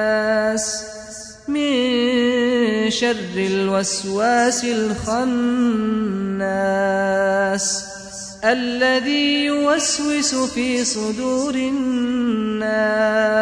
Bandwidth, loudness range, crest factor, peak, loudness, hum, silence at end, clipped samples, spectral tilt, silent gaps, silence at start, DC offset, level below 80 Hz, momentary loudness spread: 10.5 kHz; 1 LU; 14 dB; -6 dBFS; -19 LUFS; none; 0 s; under 0.1%; -3.5 dB/octave; none; 0 s; under 0.1%; -52 dBFS; 5 LU